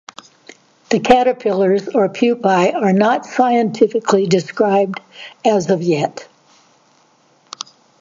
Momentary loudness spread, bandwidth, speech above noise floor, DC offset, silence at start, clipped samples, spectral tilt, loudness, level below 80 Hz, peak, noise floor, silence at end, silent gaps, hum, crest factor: 18 LU; 7.8 kHz; 40 dB; under 0.1%; 0.9 s; under 0.1%; -6 dB/octave; -15 LUFS; -56 dBFS; 0 dBFS; -55 dBFS; 1.75 s; none; none; 16 dB